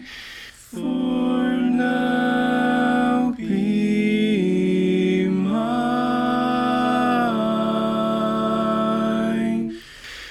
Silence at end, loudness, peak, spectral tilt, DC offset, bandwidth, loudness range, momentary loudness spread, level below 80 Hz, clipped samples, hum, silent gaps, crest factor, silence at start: 0 s; -21 LUFS; -8 dBFS; -6.5 dB/octave; under 0.1%; 12.5 kHz; 1 LU; 7 LU; -52 dBFS; under 0.1%; none; none; 12 dB; 0 s